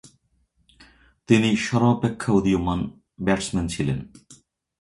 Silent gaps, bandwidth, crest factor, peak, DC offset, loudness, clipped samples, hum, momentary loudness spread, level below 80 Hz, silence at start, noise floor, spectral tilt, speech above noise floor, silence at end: none; 11.5 kHz; 20 dB; -4 dBFS; under 0.1%; -23 LUFS; under 0.1%; none; 9 LU; -44 dBFS; 1.3 s; -67 dBFS; -6 dB/octave; 45 dB; 0.5 s